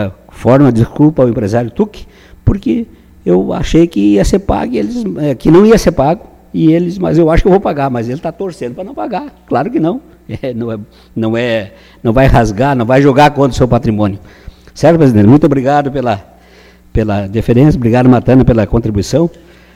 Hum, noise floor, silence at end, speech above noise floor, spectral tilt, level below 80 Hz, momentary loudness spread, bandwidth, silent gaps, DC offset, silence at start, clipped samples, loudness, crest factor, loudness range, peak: none; -41 dBFS; 0.45 s; 31 dB; -7.5 dB/octave; -26 dBFS; 13 LU; 15.5 kHz; none; under 0.1%; 0 s; 0.3%; -11 LUFS; 10 dB; 6 LU; 0 dBFS